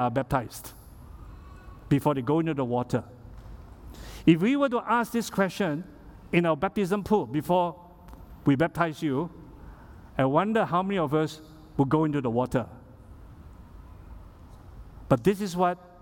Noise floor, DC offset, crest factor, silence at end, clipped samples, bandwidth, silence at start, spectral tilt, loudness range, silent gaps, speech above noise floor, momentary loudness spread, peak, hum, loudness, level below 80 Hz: -48 dBFS; under 0.1%; 20 dB; 0.15 s; under 0.1%; 18 kHz; 0 s; -7 dB/octave; 4 LU; none; 22 dB; 23 LU; -6 dBFS; none; -26 LUFS; -50 dBFS